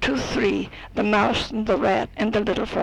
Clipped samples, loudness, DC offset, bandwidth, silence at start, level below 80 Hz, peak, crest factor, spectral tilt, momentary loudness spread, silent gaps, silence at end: under 0.1%; -23 LUFS; under 0.1%; 11 kHz; 0 s; -42 dBFS; -8 dBFS; 14 dB; -5 dB/octave; 5 LU; none; 0 s